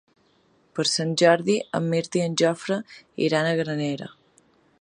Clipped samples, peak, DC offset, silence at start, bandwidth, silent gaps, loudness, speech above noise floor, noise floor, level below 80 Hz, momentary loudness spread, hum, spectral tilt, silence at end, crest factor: under 0.1%; -4 dBFS; under 0.1%; 0.75 s; 11 kHz; none; -23 LUFS; 39 dB; -62 dBFS; -70 dBFS; 13 LU; none; -4.5 dB/octave; 0.7 s; 20 dB